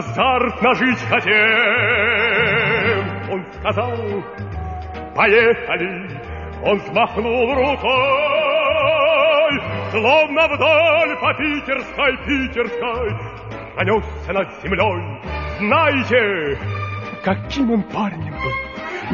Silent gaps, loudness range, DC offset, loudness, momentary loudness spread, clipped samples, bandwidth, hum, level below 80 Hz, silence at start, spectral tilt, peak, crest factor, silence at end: none; 5 LU; under 0.1%; -17 LUFS; 13 LU; under 0.1%; 7.2 kHz; none; -38 dBFS; 0 s; -6 dB/octave; 0 dBFS; 18 dB; 0 s